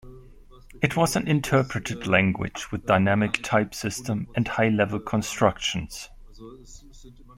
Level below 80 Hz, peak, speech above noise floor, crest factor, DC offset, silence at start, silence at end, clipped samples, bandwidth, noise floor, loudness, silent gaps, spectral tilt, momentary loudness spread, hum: -48 dBFS; -4 dBFS; 24 dB; 22 dB; under 0.1%; 0.05 s; 0.05 s; under 0.1%; 16.5 kHz; -48 dBFS; -24 LUFS; none; -5 dB/octave; 10 LU; none